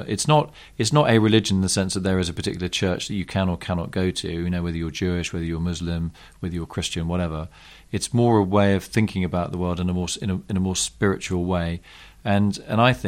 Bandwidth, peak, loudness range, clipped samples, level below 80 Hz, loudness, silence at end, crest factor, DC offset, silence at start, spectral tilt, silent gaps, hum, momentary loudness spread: 15 kHz; -4 dBFS; 5 LU; under 0.1%; -42 dBFS; -23 LUFS; 0 s; 18 dB; under 0.1%; 0 s; -5 dB/octave; none; none; 10 LU